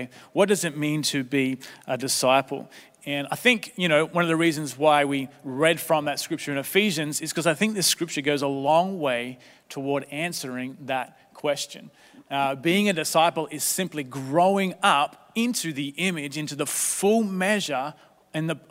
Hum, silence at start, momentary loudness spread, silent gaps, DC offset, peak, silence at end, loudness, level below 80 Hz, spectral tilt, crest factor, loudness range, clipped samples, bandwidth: none; 0 s; 10 LU; none; under 0.1%; -2 dBFS; 0.15 s; -24 LUFS; -74 dBFS; -3.5 dB/octave; 22 dB; 4 LU; under 0.1%; 16 kHz